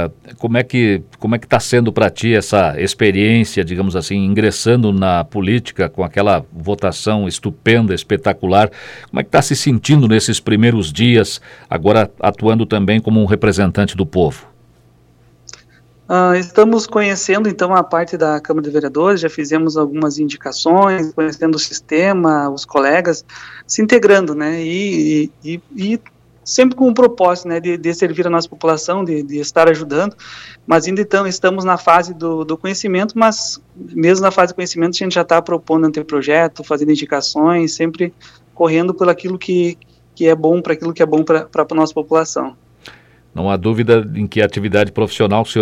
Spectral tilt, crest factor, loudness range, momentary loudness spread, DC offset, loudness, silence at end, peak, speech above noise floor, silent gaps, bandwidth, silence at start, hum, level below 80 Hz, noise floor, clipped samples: -5.5 dB/octave; 14 dB; 3 LU; 9 LU; under 0.1%; -15 LUFS; 0 s; 0 dBFS; 35 dB; none; 14 kHz; 0 s; none; -46 dBFS; -49 dBFS; under 0.1%